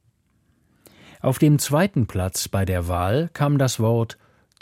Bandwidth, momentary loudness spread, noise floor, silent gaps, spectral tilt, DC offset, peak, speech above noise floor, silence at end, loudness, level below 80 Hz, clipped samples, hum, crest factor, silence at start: 16.5 kHz; 6 LU; -64 dBFS; none; -6 dB/octave; under 0.1%; -6 dBFS; 44 dB; 0.5 s; -21 LUFS; -46 dBFS; under 0.1%; none; 16 dB; 1.25 s